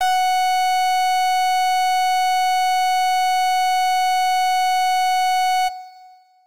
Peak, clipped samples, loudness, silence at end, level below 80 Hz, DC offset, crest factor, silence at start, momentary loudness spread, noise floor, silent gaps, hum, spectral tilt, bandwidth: -14 dBFS; under 0.1%; -18 LUFS; 0 s; -72 dBFS; 2%; 6 dB; 0 s; 0 LU; -48 dBFS; none; none; 3.5 dB/octave; 16 kHz